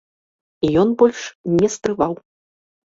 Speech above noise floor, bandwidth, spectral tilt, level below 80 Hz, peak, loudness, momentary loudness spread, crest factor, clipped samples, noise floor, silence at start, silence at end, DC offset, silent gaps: over 72 dB; 7.8 kHz; -6 dB/octave; -52 dBFS; -2 dBFS; -18 LUFS; 9 LU; 18 dB; under 0.1%; under -90 dBFS; 0.6 s; 0.85 s; under 0.1%; 1.35-1.44 s